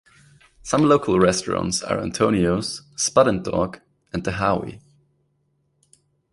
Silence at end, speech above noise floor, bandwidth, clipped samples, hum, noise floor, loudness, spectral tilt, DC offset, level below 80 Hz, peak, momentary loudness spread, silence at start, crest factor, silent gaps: 1.55 s; 48 dB; 11.5 kHz; under 0.1%; none; -68 dBFS; -21 LUFS; -4.5 dB/octave; under 0.1%; -46 dBFS; -2 dBFS; 11 LU; 0.65 s; 20 dB; none